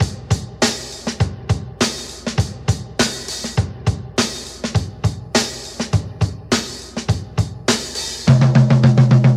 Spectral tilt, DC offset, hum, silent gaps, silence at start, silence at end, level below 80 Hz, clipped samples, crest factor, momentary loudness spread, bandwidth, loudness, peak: -5 dB/octave; under 0.1%; none; none; 0 s; 0 s; -36 dBFS; under 0.1%; 18 dB; 12 LU; 13.5 kHz; -19 LUFS; 0 dBFS